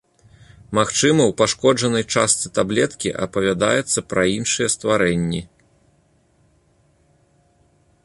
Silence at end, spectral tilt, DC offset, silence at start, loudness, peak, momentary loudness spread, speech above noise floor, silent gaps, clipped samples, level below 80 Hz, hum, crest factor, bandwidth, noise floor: 2.6 s; -3.5 dB/octave; under 0.1%; 0.7 s; -19 LUFS; -2 dBFS; 7 LU; 41 dB; none; under 0.1%; -50 dBFS; none; 18 dB; 11.5 kHz; -60 dBFS